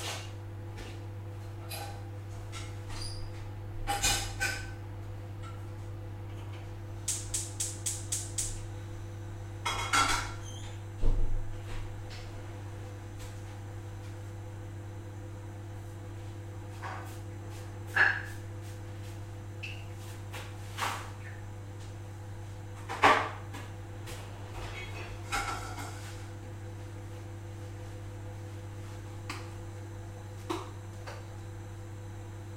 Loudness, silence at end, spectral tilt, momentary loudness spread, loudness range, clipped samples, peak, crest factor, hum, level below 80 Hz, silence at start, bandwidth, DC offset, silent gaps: -37 LUFS; 0 s; -3 dB/octave; 14 LU; 10 LU; under 0.1%; -8 dBFS; 28 dB; none; -44 dBFS; 0 s; 16 kHz; under 0.1%; none